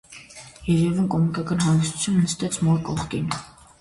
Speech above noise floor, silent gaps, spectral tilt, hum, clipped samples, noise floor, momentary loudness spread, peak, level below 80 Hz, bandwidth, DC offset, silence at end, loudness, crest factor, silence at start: 22 dB; none; -5.5 dB/octave; none; under 0.1%; -44 dBFS; 12 LU; -8 dBFS; -48 dBFS; 11.5 kHz; under 0.1%; 0.3 s; -23 LUFS; 14 dB; 0.1 s